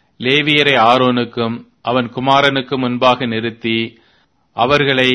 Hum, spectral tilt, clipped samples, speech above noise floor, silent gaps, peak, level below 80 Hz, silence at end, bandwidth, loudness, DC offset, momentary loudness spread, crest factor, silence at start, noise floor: none; -5.5 dB/octave; 0.1%; 42 dB; none; 0 dBFS; -52 dBFS; 0 s; 11 kHz; -14 LUFS; under 0.1%; 10 LU; 16 dB; 0.2 s; -57 dBFS